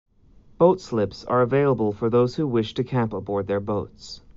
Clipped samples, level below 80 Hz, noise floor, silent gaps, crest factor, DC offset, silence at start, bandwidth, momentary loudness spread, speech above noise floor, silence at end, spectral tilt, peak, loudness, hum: under 0.1%; -52 dBFS; -52 dBFS; none; 18 dB; under 0.1%; 0.6 s; 7.6 kHz; 8 LU; 30 dB; 0.2 s; -7 dB/octave; -6 dBFS; -23 LUFS; none